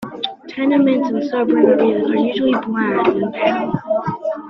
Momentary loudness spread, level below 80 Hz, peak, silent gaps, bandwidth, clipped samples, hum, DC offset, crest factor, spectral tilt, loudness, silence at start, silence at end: 8 LU; -58 dBFS; 0 dBFS; none; 6 kHz; under 0.1%; none; under 0.1%; 16 dB; -7.5 dB/octave; -17 LUFS; 0 s; 0 s